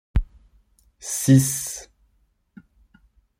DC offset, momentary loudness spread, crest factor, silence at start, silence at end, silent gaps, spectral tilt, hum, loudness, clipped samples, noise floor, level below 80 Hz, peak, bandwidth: under 0.1%; 20 LU; 20 dB; 0.15 s; 1.55 s; none; -5.5 dB/octave; none; -21 LUFS; under 0.1%; -66 dBFS; -34 dBFS; -4 dBFS; 16.5 kHz